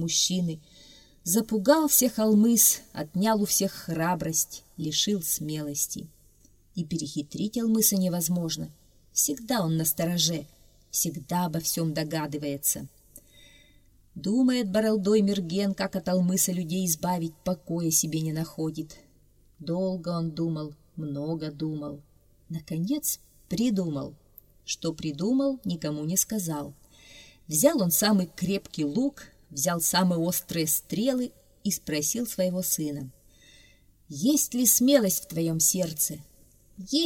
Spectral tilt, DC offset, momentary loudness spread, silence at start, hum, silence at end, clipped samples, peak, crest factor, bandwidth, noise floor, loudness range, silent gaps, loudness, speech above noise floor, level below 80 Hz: -4 dB/octave; under 0.1%; 14 LU; 0 s; none; 0 s; under 0.1%; -6 dBFS; 22 dB; 16.5 kHz; -60 dBFS; 8 LU; none; -26 LUFS; 33 dB; -60 dBFS